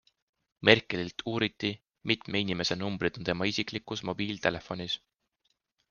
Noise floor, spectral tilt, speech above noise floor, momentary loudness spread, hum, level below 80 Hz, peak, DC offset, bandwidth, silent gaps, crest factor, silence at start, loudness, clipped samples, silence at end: -78 dBFS; -4.5 dB/octave; 47 dB; 12 LU; none; -62 dBFS; -4 dBFS; under 0.1%; 7.2 kHz; none; 28 dB; 0.6 s; -30 LUFS; under 0.1%; 0.95 s